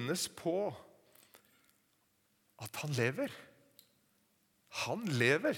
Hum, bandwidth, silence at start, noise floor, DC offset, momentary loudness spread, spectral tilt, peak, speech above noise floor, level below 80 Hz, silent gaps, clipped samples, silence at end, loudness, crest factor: none; 19 kHz; 0 s; -75 dBFS; under 0.1%; 17 LU; -4.5 dB/octave; -14 dBFS; 40 dB; -80 dBFS; none; under 0.1%; 0 s; -36 LUFS; 24 dB